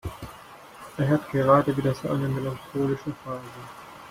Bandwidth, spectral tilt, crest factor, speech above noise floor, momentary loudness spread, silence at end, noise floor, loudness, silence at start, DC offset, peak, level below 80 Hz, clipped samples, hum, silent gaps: 16 kHz; -7.5 dB/octave; 22 dB; 21 dB; 22 LU; 0 s; -46 dBFS; -25 LUFS; 0.05 s; under 0.1%; -4 dBFS; -54 dBFS; under 0.1%; none; none